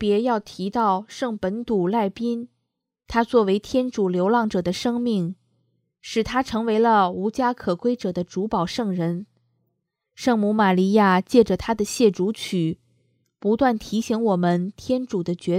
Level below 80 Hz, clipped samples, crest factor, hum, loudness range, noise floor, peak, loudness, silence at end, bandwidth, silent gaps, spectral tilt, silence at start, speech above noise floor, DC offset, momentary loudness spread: -52 dBFS; under 0.1%; 20 dB; none; 4 LU; -79 dBFS; -2 dBFS; -22 LUFS; 0 s; 15 kHz; none; -6 dB/octave; 0 s; 57 dB; under 0.1%; 9 LU